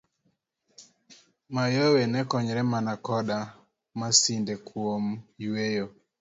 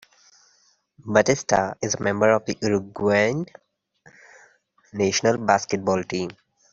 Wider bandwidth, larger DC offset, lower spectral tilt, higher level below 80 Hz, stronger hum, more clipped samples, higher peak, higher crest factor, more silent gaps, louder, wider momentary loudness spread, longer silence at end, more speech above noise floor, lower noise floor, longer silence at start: about the same, 8 kHz vs 7.8 kHz; neither; about the same, -4 dB/octave vs -4.5 dB/octave; second, -68 dBFS vs -60 dBFS; neither; neither; about the same, -6 dBFS vs -4 dBFS; about the same, 22 dB vs 20 dB; neither; second, -27 LUFS vs -22 LUFS; first, 14 LU vs 11 LU; about the same, 0.3 s vs 0.4 s; first, 47 dB vs 41 dB; first, -74 dBFS vs -63 dBFS; second, 0.8 s vs 1.05 s